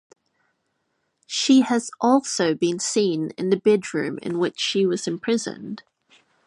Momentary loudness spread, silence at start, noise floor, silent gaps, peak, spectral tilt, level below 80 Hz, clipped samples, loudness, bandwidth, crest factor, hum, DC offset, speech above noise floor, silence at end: 10 LU; 1.3 s; -73 dBFS; none; -4 dBFS; -4 dB/octave; -72 dBFS; under 0.1%; -22 LUFS; 11.5 kHz; 18 dB; none; under 0.1%; 52 dB; 0.65 s